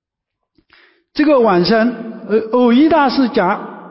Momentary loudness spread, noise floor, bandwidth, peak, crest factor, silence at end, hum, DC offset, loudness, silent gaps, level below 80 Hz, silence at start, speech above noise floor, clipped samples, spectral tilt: 9 LU; -77 dBFS; 5.8 kHz; -4 dBFS; 12 dB; 0 s; none; under 0.1%; -13 LUFS; none; -52 dBFS; 1.15 s; 65 dB; under 0.1%; -10 dB/octave